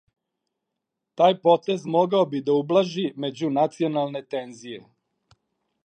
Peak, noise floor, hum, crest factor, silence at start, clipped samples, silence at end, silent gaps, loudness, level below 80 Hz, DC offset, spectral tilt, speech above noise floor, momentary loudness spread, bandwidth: -4 dBFS; -83 dBFS; none; 20 dB; 1.2 s; under 0.1%; 1.05 s; none; -23 LUFS; -78 dBFS; under 0.1%; -6.5 dB/octave; 60 dB; 13 LU; 9 kHz